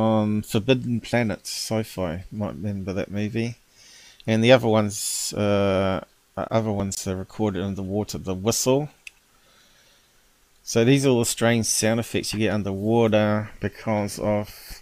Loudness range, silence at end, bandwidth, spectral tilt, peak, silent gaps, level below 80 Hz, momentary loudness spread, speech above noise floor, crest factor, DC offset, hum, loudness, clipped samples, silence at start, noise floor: 6 LU; 0 s; 16 kHz; -5 dB/octave; -4 dBFS; none; -52 dBFS; 11 LU; 37 dB; 20 dB; under 0.1%; none; -23 LUFS; under 0.1%; 0 s; -59 dBFS